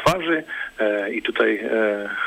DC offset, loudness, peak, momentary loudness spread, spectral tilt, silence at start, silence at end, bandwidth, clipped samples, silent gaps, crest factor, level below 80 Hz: under 0.1%; -22 LUFS; -6 dBFS; 4 LU; -5 dB/octave; 0 s; 0 s; 16 kHz; under 0.1%; none; 16 dB; -50 dBFS